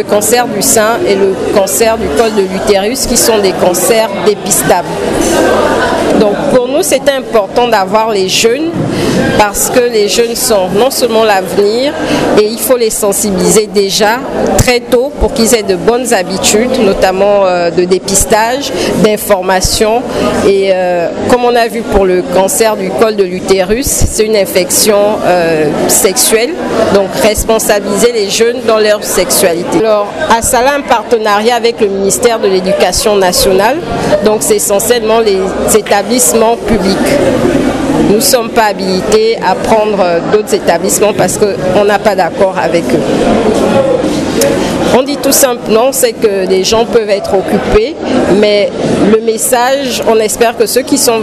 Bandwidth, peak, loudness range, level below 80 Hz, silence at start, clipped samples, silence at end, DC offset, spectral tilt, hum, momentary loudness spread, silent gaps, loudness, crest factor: 16.5 kHz; 0 dBFS; 1 LU; -30 dBFS; 0 s; 0.4%; 0 s; under 0.1%; -3.5 dB/octave; none; 4 LU; none; -9 LUFS; 8 dB